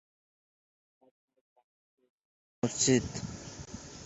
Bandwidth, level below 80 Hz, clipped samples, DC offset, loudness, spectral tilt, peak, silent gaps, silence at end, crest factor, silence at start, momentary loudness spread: 8.2 kHz; -58 dBFS; under 0.1%; under 0.1%; -30 LUFS; -4 dB/octave; -12 dBFS; none; 0 s; 24 dB; 2.65 s; 18 LU